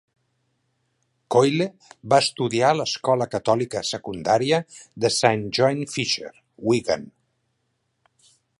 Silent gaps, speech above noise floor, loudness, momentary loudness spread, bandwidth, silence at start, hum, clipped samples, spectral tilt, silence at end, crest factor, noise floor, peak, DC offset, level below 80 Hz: none; 51 dB; -22 LUFS; 9 LU; 11.5 kHz; 1.3 s; none; under 0.1%; -4.5 dB/octave; 1.5 s; 22 dB; -73 dBFS; -2 dBFS; under 0.1%; -62 dBFS